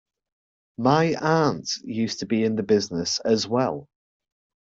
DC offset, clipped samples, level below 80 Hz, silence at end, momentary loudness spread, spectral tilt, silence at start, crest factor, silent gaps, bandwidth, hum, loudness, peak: under 0.1%; under 0.1%; -62 dBFS; 0.85 s; 8 LU; -5 dB/octave; 0.8 s; 18 dB; none; 8 kHz; none; -23 LUFS; -6 dBFS